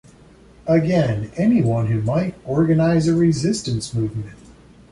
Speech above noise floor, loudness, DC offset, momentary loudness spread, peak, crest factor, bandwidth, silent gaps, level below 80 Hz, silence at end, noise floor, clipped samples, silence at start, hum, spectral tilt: 29 dB; -19 LUFS; under 0.1%; 8 LU; -4 dBFS; 14 dB; 11.5 kHz; none; -46 dBFS; 0.55 s; -47 dBFS; under 0.1%; 0.65 s; none; -7 dB/octave